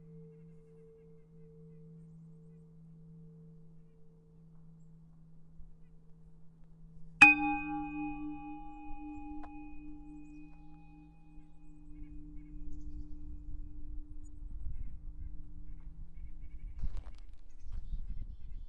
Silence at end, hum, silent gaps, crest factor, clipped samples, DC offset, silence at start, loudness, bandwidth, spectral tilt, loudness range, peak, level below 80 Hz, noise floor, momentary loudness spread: 0 s; none; none; 34 dB; under 0.1%; under 0.1%; 0 s; -28 LUFS; 9.6 kHz; -4.5 dB/octave; 25 LU; -4 dBFS; -48 dBFS; -57 dBFS; 18 LU